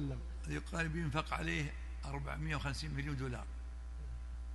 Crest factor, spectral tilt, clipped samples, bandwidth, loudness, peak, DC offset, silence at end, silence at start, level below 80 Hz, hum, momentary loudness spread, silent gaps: 20 dB; -5.5 dB/octave; under 0.1%; 11.5 kHz; -41 LUFS; -20 dBFS; under 0.1%; 0 s; 0 s; -44 dBFS; none; 10 LU; none